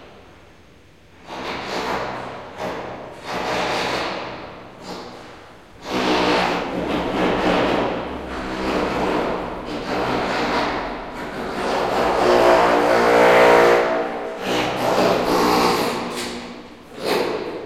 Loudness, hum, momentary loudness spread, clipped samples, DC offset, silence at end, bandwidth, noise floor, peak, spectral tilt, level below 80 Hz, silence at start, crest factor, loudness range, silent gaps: -20 LUFS; none; 19 LU; under 0.1%; 0.2%; 0 s; 16 kHz; -49 dBFS; -2 dBFS; -4.5 dB/octave; -44 dBFS; 0 s; 18 dB; 11 LU; none